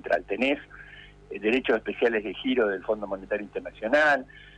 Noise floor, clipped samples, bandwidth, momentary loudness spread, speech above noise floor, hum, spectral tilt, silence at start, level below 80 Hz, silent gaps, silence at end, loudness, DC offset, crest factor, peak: -48 dBFS; under 0.1%; 9.8 kHz; 14 LU; 22 dB; 50 Hz at -55 dBFS; -5 dB/octave; 0.05 s; -56 dBFS; none; 0.1 s; -26 LUFS; under 0.1%; 16 dB; -12 dBFS